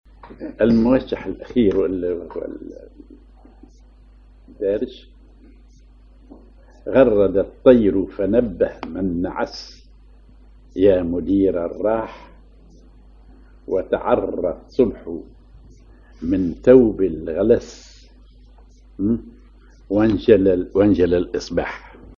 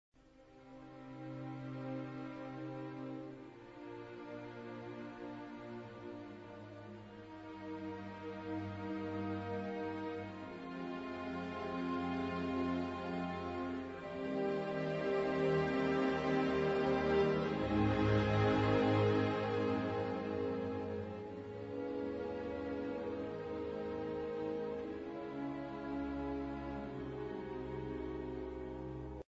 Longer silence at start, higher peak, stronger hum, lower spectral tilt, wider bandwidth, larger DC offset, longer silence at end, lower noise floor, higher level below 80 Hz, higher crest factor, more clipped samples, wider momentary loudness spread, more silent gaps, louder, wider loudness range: about the same, 0.25 s vs 0.25 s; first, 0 dBFS vs -20 dBFS; neither; first, -8 dB/octave vs -6 dB/octave; about the same, 7.2 kHz vs 7.6 kHz; neither; about the same, 0.05 s vs 0.05 s; second, -47 dBFS vs -62 dBFS; first, -42 dBFS vs -58 dBFS; about the same, 20 dB vs 20 dB; neither; about the same, 18 LU vs 16 LU; neither; first, -19 LUFS vs -39 LUFS; second, 11 LU vs 15 LU